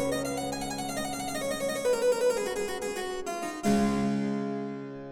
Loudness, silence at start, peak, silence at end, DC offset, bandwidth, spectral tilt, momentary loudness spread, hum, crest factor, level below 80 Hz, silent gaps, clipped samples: -30 LUFS; 0 s; -14 dBFS; 0 s; under 0.1%; 17.5 kHz; -4.5 dB/octave; 8 LU; none; 16 dB; -54 dBFS; none; under 0.1%